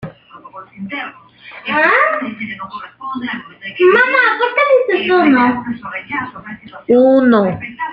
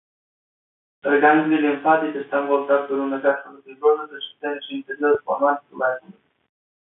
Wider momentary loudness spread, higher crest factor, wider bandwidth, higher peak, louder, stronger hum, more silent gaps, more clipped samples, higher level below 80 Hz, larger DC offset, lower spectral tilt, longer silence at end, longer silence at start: first, 19 LU vs 13 LU; second, 14 dB vs 20 dB; first, 5.4 kHz vs 3.9 kHz; about the same, -2 dBFS vs -2 dBFS; first, -13 LUFS vs -21 LUFS; neither; neither; neither; first, -56 dBFS vs -72 dBFS; neither; second, -7.5 dB/octave vs -9.5 dB/octave; second, 0 s vs 0.8 s; second, 0 s vs 1.05 s